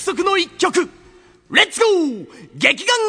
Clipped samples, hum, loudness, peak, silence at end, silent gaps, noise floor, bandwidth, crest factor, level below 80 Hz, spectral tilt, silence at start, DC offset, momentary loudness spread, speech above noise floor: under 0.1%; none; -16 LUFS; 0 dBFS; 0 s; none; -48 dBFS; 11 kHz; 18 dB; -60 dBFS; -2 dB/octave; 0 s; under 0.1%; 9 LU; 31 dB